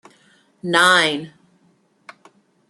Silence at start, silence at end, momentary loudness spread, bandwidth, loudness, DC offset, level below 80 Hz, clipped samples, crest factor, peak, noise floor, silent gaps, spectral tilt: 0.65 s; 1.4 s; 20 LU; 12.5 kHz; -16 LUFS; under 0.1%; -72 dBFS; under 0.1%; 22 dB; 0 dBFS; -60 dBFS; none; -2.5 dB/octave